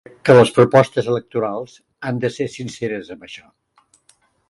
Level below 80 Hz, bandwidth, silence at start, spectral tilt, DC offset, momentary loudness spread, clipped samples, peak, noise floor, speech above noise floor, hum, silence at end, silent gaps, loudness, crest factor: -56 dBFS; 11.5 kHz; 0.25 s; -6.5 dB/octave; under 0.1%; 23 LU; under 0.1%; 0 dBFS; -59 dBFS; 41 dB; none; 1.15 s; none; -17 LUFS; 18 dB